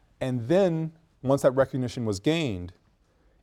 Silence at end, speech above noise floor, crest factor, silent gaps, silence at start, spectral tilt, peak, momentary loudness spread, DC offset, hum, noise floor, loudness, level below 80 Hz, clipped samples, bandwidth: 0.7 s; 39 dB; 18 dB; none; 0.2 s; -6.5 dB/octave; -8 dBFS; 12 LU; under 0.1%; none; -64 dBFS; -26 LUFS; -56 dBFS; under 0.1%; 15 kHz